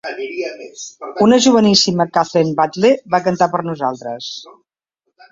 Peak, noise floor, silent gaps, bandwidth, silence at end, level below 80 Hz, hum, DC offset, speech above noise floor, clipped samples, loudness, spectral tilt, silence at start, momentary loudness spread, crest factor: 0 dBFS; -73 dBFS; none; 7.8 kHz; 0.8 s; -58 dBFS; none; under 0.1%; 57 dB; under 0.1%; -15 LUFS; -4.5 dB/octave; 0.05 s; 18 LU; 16 dB